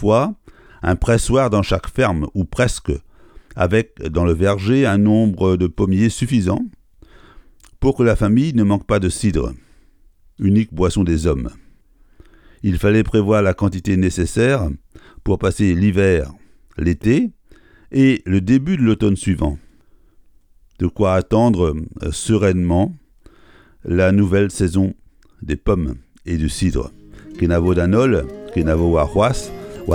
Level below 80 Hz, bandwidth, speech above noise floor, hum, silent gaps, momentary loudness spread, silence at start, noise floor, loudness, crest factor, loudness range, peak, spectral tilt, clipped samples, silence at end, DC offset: -32 dBFS; 13 kHz; 34 dB; none; none; 11 LU; 0 s; -50 dBFS; -18 LUFS; 16 dB; 2 LU; -2 dBFS; -7 dB/octave; under 0.1%; 0 s; under 0.1%